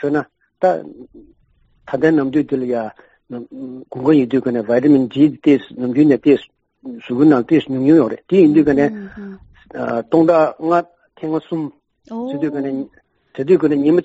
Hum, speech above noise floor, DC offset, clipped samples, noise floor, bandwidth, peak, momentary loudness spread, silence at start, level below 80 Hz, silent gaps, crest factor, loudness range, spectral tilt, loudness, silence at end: none; 41 dB; under 0.1%; under 0.1%; -57 dBFS; 7.8 kHz; -2 dBFS; 19 LU; 0 s; -56 dBFS; none; 14 dB; 6 LU; -7 dB/octave; -16 LUFS; 0 s